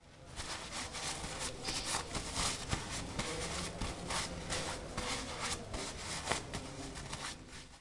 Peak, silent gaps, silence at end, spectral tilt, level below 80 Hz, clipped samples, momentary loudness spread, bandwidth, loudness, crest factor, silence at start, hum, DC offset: -14 dBFS; none; 0 s; -2.5 dB/octave; -52 dBFS; under 0.1%; 8 LU; 11.5 kHz; -39 LUFS; 26 dB; 0 s; none; under 0.1%